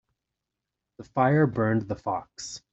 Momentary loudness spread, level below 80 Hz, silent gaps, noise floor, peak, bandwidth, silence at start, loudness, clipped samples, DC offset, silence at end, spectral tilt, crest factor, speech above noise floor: 14 LU; -60 dBFS; none; -86 dBFS; -8 dBFS; 8.2 kHz; 1 s; -26 LUFS; under 0.1%; under 0.1%; 0.15 s; -6.5 dB/octave; 20 dB; 60 dB